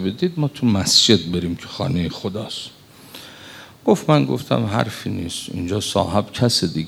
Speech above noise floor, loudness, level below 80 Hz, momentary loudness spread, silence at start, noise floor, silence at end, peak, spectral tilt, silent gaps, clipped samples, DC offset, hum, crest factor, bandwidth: 22 dB; -19 LUFS; -54 dBFS; 22 LU; 0 s; -41 dBFS; 0 s; -2 dBFS; -4.5 dB/octave; none; under 0.1%; under 0.1%; none; 20 dB; 16.5 kHz